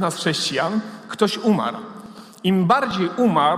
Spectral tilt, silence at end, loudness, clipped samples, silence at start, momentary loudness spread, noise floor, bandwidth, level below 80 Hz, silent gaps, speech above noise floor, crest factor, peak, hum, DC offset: -5 dB/octave; 0 s; -20 LUFS; under 0.1%; 0 s; 17 LU; -40 dBFS; 15.5 kHz; -62 dBFS; none; 20 dB; 18 dB; -2 dBFS; none; under 0.1%